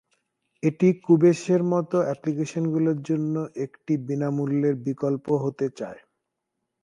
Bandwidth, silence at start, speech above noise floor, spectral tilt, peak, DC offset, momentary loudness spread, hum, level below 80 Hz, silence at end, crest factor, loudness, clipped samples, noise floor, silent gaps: 10.5 kHz; 0.65 s; 58 dB; -8 dB/octave; -6 dBFS; under 0.1%; 10 LU; none; -70 dBFS; 0.85 s; 18 dB; -24 LUFS; under 0.1%; -81 dBFS; none